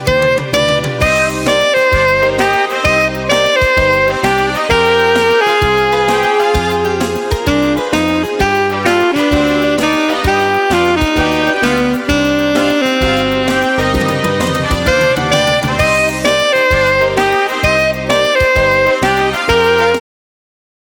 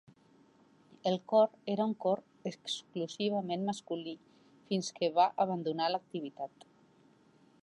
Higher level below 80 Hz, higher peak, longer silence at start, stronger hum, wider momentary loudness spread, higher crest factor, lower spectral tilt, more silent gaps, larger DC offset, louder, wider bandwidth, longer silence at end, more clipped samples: first, -28 dBFS vs -86 dBFS; first, 0 dBFS vs -16 dBFS; second, 0 s vs 1.05 s; neither; second, 3 LU vs 14 LU; second, 12 dB vs 20 dB; about the same, -4.5 dB/octave vs -5.5 dB/octave; neither; neither; first, -12 LUFS vs -34 LUFS; first, 19.5 kHz vs 11.5 kHz; second, 1 s vs 1.15 s; neither